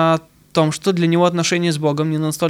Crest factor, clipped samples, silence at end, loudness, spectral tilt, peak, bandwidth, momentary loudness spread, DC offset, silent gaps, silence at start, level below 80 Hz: 14 dB; under 0.1%; 0 s; -18 LUFS; -5.5 dB/octave; -2 dBFS; 15.5 kHz; 5 LU; under 0.1%; none; 0 s; -58 dBFS